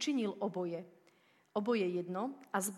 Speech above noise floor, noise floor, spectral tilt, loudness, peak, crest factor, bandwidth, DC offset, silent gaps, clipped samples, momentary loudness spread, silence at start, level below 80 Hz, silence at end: 33 dB; -69 dBFS; -4.5 dB/octave; -37 LUFS; -20 dBFS; 18 dB; 15.5 kHz; under 0.1%; none; under 0.1%; 8 LU; 0 s; -88 dBFS; 0 s